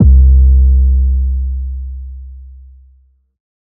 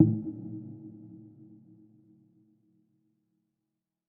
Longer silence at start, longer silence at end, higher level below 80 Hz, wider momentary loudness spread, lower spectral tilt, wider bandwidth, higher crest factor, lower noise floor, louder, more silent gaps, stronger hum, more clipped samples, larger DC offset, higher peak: about the same, 0 s vs 0 s; second, 1.25 s vs 2.8 s; first, -12 dBFS vs -72 dBFS; about the same, 22 LU vs 23 LU; about the same, -17.5 dB/octave vs -16.5 dB/octave; second, 0.6 kHz vs 1.4 kHz; second, 12 dB vs 28 dB; second, -50 dBFS vs -86 dBFS; first, -12 LUFS vs -34 LUFS; neither; second, none vs 60 Hz at -70 dBFS; neither; neither; first, 0 dBFS vs -8 dBFS